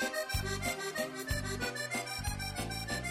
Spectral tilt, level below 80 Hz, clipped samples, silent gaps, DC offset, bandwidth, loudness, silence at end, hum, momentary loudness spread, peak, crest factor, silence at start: -3.5 dB/octave; -46 dBFS; under 0.1%; none; under 0.1%; 16.5 kHz; -36 LUFS; 0 s; none; 3 LU; -20 dBFS; 16 dB; 0 s